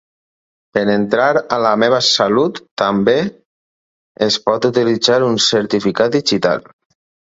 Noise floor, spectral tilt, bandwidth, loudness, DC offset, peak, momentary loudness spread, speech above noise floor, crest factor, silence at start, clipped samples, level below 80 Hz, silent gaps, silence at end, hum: under -90 dBFS; -4 dB/octave; 8 kHz; -15 LUFS; under 0.1%; 0 dBFS; 7 LU; over 75 dB; 16 dB; 0.75 s; under 0.1%; -56 dBFS; 2.71-2.77 s, 3.45-4.15 s; 0.75 s; none